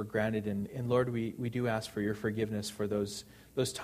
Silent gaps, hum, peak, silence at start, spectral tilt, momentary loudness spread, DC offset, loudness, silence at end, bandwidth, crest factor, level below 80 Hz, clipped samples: none; none; -16 dBFS; 0 s; -5.5 dB/octave; 6 LU; under 0.1%; -34 LUFS; 0 s; 15.5 kHz; 16 dB; -62 dBFS; under 0.1%